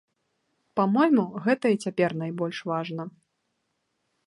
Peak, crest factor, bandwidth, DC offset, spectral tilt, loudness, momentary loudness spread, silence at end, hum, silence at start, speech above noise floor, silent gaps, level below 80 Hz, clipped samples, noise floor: -10 dBFS; 18 dB; 11.5 kHz; under 0.1%; -7 dB/octave; -26 LUFS; 12 LU; 1.2 s; none; 0.75 s; 52 dB; none; -76 dBFS; under 0.1%; -77 dBFS